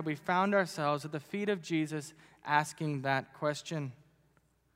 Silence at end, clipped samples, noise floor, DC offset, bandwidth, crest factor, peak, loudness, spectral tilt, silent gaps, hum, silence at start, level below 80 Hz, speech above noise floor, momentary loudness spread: 0.8 s; under 0.1%; -71 dBFS; under 0.1%; 16 kHz; 22 dB; -12 dBFS; -33 LUFS; -5.5 dB/octave; none; none; 0 s; -78 dBFS; 37 dB; 11 LU